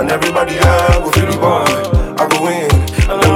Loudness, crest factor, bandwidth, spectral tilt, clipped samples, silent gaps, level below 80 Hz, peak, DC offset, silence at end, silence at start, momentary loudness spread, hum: -13 LUFS; 12 dB; 17 kHz; -5 dB/octave; under 0.1%; none; -20 dBFS; 0 dBFS; under 0.1%; 0 s; 0 s; 4 LU; none